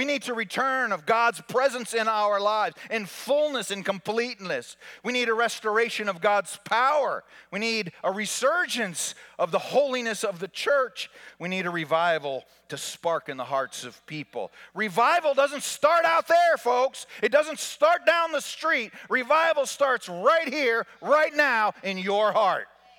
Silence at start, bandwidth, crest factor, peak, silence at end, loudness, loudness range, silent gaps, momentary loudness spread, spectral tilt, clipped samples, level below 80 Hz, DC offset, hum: 0 s; 18 kHz; 18 dB; -6 dBFS; 0.35 s; -25 LUFS; 5 LU; none; 11 LU; -2.5 dB/octave; under 0.1%; -78 dBFS; under 0.1%; none